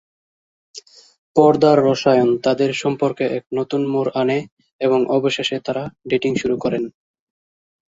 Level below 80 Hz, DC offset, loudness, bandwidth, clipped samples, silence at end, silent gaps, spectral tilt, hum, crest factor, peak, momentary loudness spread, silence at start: -58 dBFS; under 0.1%; -18 LUFS; 7.8 kHz; under 0.1%; 1.05 s; 1.18-1.34 s, 4.52-4.57 s, 4.72-4.79 s; -6 dB/octave; none; 18 dB; -2 dBFS; 11 LU; 0.75 s